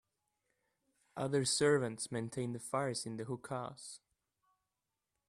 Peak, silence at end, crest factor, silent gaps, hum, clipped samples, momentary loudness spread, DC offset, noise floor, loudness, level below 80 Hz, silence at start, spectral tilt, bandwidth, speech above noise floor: -20 dBFS; 1.3 s; 20 dB; none; none; under 0.1%; 19 LU; under 0.1%; -89 dBFS; -37 LUFS; -76 dBFS; 1.15 s; -4 dB/octave; 14 kHz; 53 dB